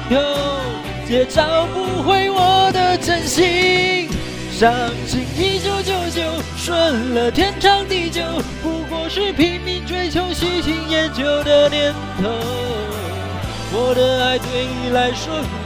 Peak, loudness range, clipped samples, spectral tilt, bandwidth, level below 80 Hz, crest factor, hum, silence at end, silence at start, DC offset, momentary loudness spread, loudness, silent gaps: 0 dBFS; 4 LU; under 0.1%; -4.5 dB/octave; 16 kHz; -34 dBFS; 18 dB; none; 0 s; 0 s; under 0.1%; 10 LU; -18 LUFS; none